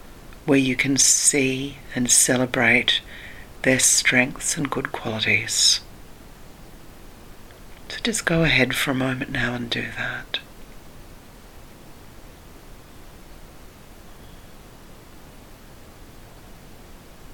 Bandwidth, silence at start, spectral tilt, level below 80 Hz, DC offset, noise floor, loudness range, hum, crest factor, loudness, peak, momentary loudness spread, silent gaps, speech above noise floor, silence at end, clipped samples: 19 kHz; 0.05 s; -2 dB/octave; -44 dBFS; under 0.1%; -44 dBFS; 12 LU; none; 22 dB; -19 LUFS; -2 dBFS; 14 LU; none; 23 dB; 0 s; under 0.1%